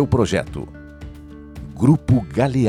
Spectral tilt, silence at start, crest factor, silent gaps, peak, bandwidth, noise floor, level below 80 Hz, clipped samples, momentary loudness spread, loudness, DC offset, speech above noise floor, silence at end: -7.5 dB/octave; 0 s; 16 dB; none; -2 dBFS; 12 kHz; -37 dBFS; -38 dBFS; under 0.1%; 21 LU; -18 LUFS; under 0.1%; 20 dB; 0 s